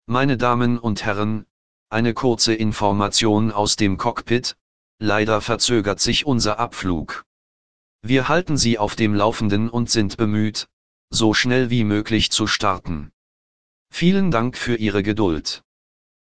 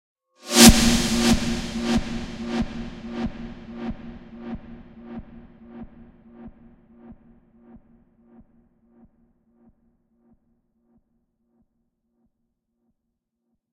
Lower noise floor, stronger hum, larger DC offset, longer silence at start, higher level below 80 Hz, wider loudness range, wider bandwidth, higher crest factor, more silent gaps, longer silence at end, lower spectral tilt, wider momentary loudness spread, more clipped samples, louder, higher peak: first, under -90 dBFS vs -79 dBFS; neither; first, 2% vs under 0.1%; second, 0 s vs 0.45 s; second, -42 dBFS vs -36 dBFS; second, 2 LU vs 29 LU; second, 10 kHz vs 16.5 kHz; second, 18 dB vs 26 dB; first, 1.50-1.86 s, 4.61-4.98 s, 7.26-7.99 s, 10.73-11.08 s, 13.13-13.86 s vs none; second, 0.65 s vs 6.6 s; first, -4.5 dB/octave vs -3 dB/octave; second, 9 LU vs 31 LU; neither; about the same, -20 LUFS vs -20 LUFS; about the same, -2 dBFS vs 0 dBFS